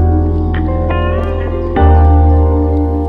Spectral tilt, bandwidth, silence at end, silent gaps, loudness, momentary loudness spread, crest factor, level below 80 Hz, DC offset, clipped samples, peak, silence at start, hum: -10.5 dB/octave; 3.8 kHz; 0 s; none; -12 LUFS; 8 LU; 10 dB; -14 dBFS; under 0.1%; under 0.1%; 0 dBFS; 0 s; none